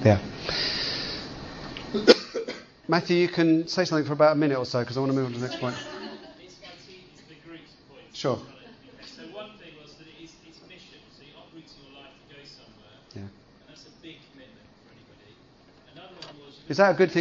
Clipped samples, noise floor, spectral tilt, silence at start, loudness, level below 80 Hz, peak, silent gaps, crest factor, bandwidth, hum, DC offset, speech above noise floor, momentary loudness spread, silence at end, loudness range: under 0.1%; -55 dBFS; -5.5 dB/octave; 0 s; -25 LUFS; -58 dBFS; 0 dBFS; none; 28 dB; 7.6 kHz; none; under 0.1%; 33 dB; 27 LU; 0 s; 25 LU